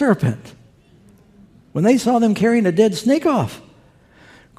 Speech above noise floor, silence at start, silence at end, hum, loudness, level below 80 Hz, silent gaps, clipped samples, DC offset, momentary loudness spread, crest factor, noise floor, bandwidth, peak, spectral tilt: 34 dB; 0 s; 1 s; none; -17 LUFS; -56 dBFS; none; under 0.1%; under 0.1%; 13 LU; 16 dB; -50 dBFS; 15 kHz; -2 dBFS; -6.5 dB/octave